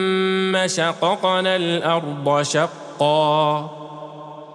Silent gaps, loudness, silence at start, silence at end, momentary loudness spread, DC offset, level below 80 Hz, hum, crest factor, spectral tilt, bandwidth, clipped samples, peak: none; -19 LUFS; 0 s; 0 s; 17 LU; under 0.1%; -74 dBFS; none; 16 dB; -4 dB/octave; 12 kHz; under 0.1%; -6 dBFS